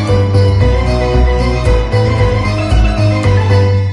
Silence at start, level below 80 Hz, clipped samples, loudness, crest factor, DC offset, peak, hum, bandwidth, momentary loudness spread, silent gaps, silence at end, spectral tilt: 0 s; -16 dBFS; under 0.1%; -12 LUFS; 10 dB; under 0.1%; 0 dBFS; none; 10.5 kHz; 3 LU; none; 0 s; -7 dB/octave